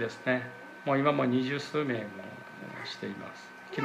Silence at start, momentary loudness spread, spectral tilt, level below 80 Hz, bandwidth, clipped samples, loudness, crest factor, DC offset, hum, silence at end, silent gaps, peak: 0 s; 17 LU; -6.5 dB/octave; -78 dBFS; 12 kHz; under 0.1%; -31 LUFS; 20 dB; under 0.1%; none; 0 s; none; -12 dBFS